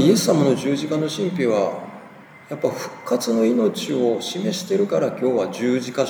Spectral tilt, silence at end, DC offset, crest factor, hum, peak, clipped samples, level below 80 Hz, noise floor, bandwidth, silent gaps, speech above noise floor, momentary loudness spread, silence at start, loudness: -5.5 dB/octave; 0 s; under 0.1%; 18 dB; none; -2 dBFS; under 0.1%; -72 dBFS; -43 dBFS; over 20 kHz; none; 23 dB; 8 LU; 0 s; -21 LUFS